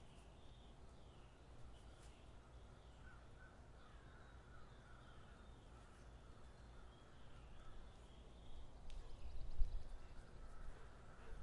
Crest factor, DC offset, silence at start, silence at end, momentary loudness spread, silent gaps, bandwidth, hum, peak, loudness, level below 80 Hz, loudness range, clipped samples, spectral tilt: 26 dB; under 0.1%; 0 s; 0 s; 7 LU; none; 11 kHz; none; -24 dBFS; -61 LUFS; -54 dBFS; 6 LU; under 0.1%; -5.5 dB/octave